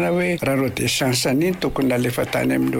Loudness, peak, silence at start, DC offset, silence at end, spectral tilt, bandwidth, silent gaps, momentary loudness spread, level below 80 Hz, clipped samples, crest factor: -20 LUFS; -10 dBFS; 0 s; under 0.1%; 0 s; -4.5 dB/octave; 16.5 kHz; none; 3 LU; -44 dBFS; under 0.1%; 10 dB